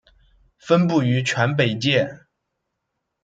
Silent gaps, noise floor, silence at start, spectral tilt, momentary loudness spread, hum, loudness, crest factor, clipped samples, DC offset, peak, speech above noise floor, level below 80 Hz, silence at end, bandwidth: none; -78 dBFS; 0.65 s; -6 dB/octave; 3 LU; none; -20 LUFS; 18 dB; under 0.1%; under 0.1%; -4 dBFS; 59 dB; -60 dBFS; 1.05 s; 9 kHz